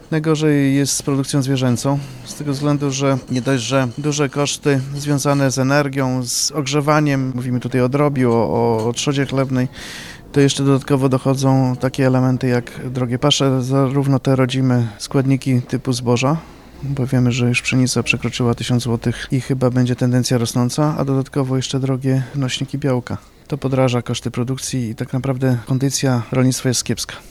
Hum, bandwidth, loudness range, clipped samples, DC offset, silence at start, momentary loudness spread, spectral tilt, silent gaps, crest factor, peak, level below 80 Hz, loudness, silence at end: none; 13.5 kHz; 3 LU; under 0.1%; under 0.1%; 0 s; 7 LU; -5.5 dB/octave; none; 16 dB; -2 dBFS; -46 dBFS; -18 LUFS; 0 s